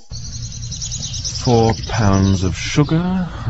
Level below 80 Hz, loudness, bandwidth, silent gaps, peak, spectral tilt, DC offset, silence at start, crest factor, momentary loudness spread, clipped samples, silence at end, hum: -32 dBFS; -18 LUFS; 8.2 kHz; none; -2 dBFS; -5.5 dB/octave; under 0.1%; 0 s; 16 dB; 13 LU; under 0.1%; 0 s; none